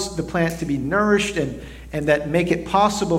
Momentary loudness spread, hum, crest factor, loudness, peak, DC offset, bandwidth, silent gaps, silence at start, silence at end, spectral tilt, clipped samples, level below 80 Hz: 9 LU; none; 18 dB; -21 LUFS; -4 dBFS; under 0.1%; 16.5 kHz; none; 0 s; 0 s; -5 dB/octave; under 0.1%; -40 dBFS